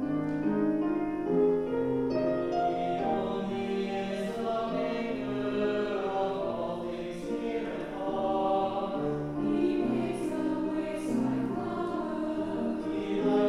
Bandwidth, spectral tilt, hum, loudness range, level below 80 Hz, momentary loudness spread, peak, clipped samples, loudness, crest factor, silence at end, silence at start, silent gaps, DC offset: 12 kHz; -7 dB/octave; none; 3 LU; -56 dBFS; 5 LU; -16 dBFS; under 0.1%; -31 LUFS; 14 dB; 0 s; 0 s; none; under 0.1%